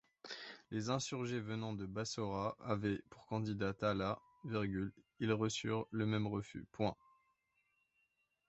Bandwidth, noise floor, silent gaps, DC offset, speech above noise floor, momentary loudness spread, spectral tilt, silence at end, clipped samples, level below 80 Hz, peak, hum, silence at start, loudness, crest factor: 8 kHz; -81 dBFS; none; under 0.1%; 42 dB; 9 LU; -5.5 dB/octave; 1.55 s; under 0.1%; -66 dBFS; -22 dBFS; none; 0.25 s; -41 LUFS; 20 dB